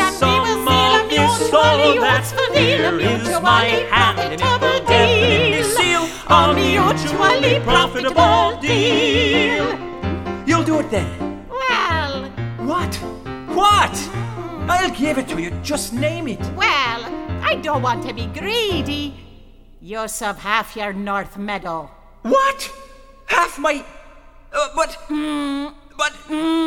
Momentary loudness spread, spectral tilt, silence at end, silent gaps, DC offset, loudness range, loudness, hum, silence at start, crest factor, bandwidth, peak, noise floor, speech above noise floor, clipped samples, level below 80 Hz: 13 LU; -4 dB/octave; 0 s; none; under 0.1%; 8 LU; -17 LUFS; none; 0 s; 18 dB; 18 kHz; 0 dBFS; -43 dBFS; 25 dB; under 0.1%; -38 dBFS